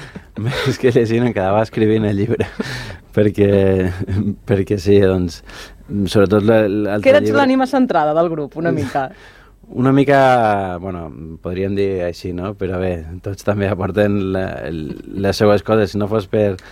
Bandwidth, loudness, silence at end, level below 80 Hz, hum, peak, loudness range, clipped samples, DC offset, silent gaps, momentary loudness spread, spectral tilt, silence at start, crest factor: 15 kHz; -17 LUFS; 0 s; -42 dBFS; none; 0 dBFS; 5 LU; under 0.1%; under 0.1%; none; 14 LU; -7 dB/octave; 0 s; 16 dB